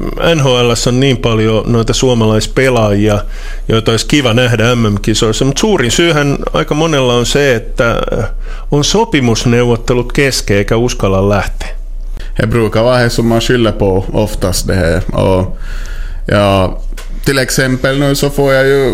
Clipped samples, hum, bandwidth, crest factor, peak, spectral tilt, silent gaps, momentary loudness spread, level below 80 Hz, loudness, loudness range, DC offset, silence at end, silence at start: under 0.1%; none; 16 kHz; 10 dB; 0 dBFS; -5 dB/octave; none; 10 LU; -20 dBFS; -11 LUFS; 3 LU; under 0.1%; 0 s; 0 s